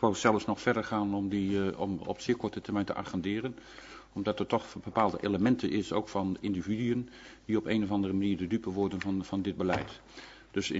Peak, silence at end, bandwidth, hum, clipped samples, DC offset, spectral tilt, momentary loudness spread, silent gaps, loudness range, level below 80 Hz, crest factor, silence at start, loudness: -8 dBFS; 0 s; 8 kHz; none; under 0.1%; under 0.1%; -6 dB/octave; 11 LU; none; 3 LU; -60 dBFS; 22 dB; 0 s; -32 LUFS